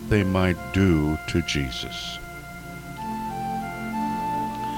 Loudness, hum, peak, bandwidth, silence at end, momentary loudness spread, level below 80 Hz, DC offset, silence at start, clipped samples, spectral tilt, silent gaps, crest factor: -26 LUFS; 60 Hz at -45 dBFS; -8 dBFS; 17 kHz; 0 s; 16 LU; -40 dBFS; under 0.1%; 0 s; under 0.1%; -6 dB/octave; none; 18 dB